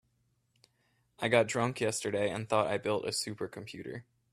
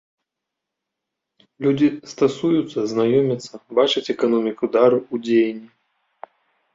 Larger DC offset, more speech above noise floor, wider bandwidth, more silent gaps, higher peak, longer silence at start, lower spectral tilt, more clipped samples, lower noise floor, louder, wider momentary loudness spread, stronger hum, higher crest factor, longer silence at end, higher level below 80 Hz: neither; second, 43 dB vs 64 dB; first, 15 kHz vs 7.8 kHz; neither; second, -10 dBFS vs -2 dBFS; second, 1.2 s vs 1.6 s; second, -4 dB/octave vs -6 dB/octave; neither; second, -75 dBFS vs -83 dBFS; second, -32 LUFS vs -20 LUFS; first, 16 LU vs 7 LU; neither; first, 24 dB vs 18 dB; second, 0.3 s vs 1.1 s; second, -70 dBFS vs -64 dBFS